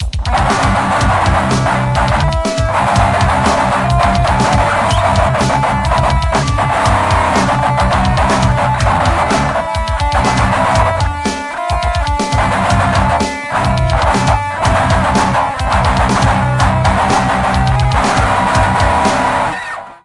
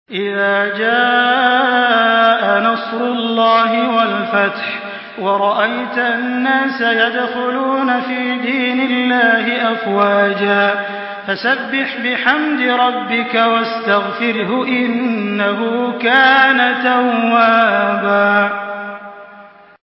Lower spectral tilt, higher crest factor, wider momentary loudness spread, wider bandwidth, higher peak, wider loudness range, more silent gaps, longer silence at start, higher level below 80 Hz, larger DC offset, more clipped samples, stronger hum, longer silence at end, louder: second, -5.5 dB/octave vs -7.5 dB/octave; about the same, 12 dB vs 14 dB; second, 4 LU vs 7 LU; first, 11.5 kHz vs 5.8 kHz; about the same, 0 dBFS vs 0 dBFS; about the same, 2 LU vs 3 LU; neither; about the same, 0 s vs 0.1 s; first, -22 dBFS vs -66 dBFS; neither; neither; neither; second, 0.1 s vs 0.35 s; about the same, -13 LUFS vs -14 LUFS